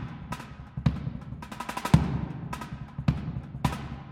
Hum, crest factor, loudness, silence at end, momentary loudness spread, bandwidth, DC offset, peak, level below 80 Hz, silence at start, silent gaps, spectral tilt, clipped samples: none; 26 dB; -31 LUFS; 0 s; 15 LU; 16 kHz; under 0.1%; -4 dBFS; -42 dBFS; 0 s; none; -7 dB/octave; under 0.1%